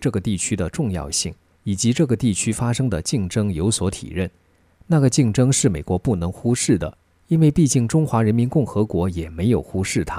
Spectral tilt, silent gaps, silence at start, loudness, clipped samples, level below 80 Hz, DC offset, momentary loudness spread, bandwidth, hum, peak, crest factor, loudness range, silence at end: -5.5 dB/octave; none; 0 s; -20 LUFS; under 0.1%; -40 dBFS; under 0.1%; 8 LU; 15.5 kHz; none; -4 dBFS; 16 dB; 3 LU; 0 s